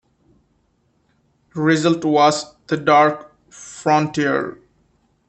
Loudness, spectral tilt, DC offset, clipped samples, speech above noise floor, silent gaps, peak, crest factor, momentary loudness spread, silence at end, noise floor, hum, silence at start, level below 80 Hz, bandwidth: -17 LUFS; -5 dB/octave; under 0.1%; under 0.1%; 46 dB; none; -2 dBFS; 18 dB; 18 LU; 0.75 s; -64 dBFS; none; 1.55 s; -62 dBFS; 8.8 kHz